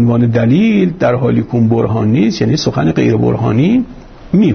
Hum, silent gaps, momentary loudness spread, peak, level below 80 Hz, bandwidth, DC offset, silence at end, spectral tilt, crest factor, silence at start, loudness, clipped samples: none; none; 3 LU; -2 dBFS; -40 dBFS; 6.6 kHz; under 0.1%; 0 s; -7.5 dB/octave; 10 dB; 0 s; -12 LUFS; under 0.1%